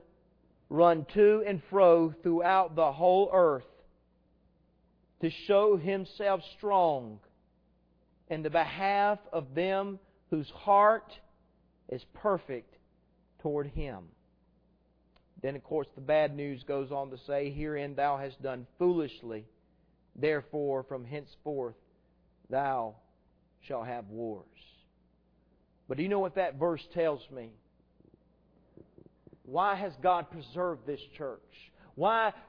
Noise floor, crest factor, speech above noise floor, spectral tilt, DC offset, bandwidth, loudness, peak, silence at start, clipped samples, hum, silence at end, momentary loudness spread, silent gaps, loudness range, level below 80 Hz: -69 dBFS; 22 dB; 39 dB; -9 dB/octave; under 0.1%; 5.4 kHz; -30 LUFS; -10 dBFS; 0.7 s; under 0.1%; none; 0.1 s; 17 LU; none; 11 LU; -58 dBFS